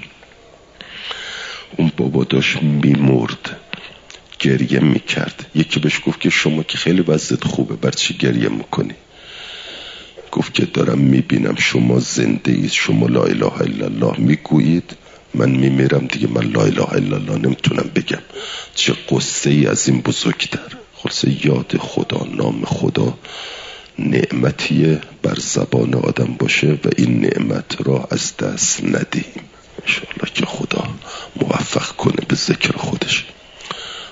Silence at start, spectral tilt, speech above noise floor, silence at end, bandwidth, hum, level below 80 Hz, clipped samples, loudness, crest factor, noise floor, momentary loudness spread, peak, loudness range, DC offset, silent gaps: 0 s; -5 dB/octave; 28 dB; 0 s; 7.8 kHz; none; -52 dBFS; under 0.1%; -17 LUFS; 18 dB; -45 dBFS; 14 LU; 0 dBFS; 4 LU; under 0.1%; none